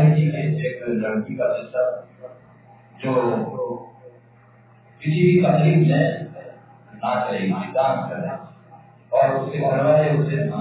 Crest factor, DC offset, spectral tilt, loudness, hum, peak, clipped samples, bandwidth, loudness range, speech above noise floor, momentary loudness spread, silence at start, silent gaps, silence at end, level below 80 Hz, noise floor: 18 dB; under 0.1%; -12 dB/octave; -21 LUFS; none; -4 dBFS; under 0.1%; 4 kHz; 6 LU; 31 dB; 14 LU; 0 s; none; 0 s; -62 dBFS; -51 dBFS